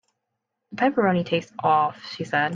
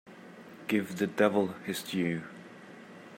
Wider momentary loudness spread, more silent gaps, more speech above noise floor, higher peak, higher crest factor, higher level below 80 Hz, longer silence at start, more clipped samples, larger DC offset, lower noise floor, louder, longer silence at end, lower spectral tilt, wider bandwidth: second, 8 LU vs 22 LU; neither; first, 58 dB vs 20 dB; first, -8 dBFS vs -12 dBFS; second, 16 dB vs 22 dB; first, -68 dBFS vs -78 dBFS; first, 0.7 s vs 0.05 s; neither; neither; first, -80 dBFS vs -50 dBFS; first, -23 LUFS vs -31 LUFS; about the same, 0 s vs 0 s; about the same, -6.5 dB/octave vs -5.5 dB/octave; second, 7.6 kHz vs 16 kHz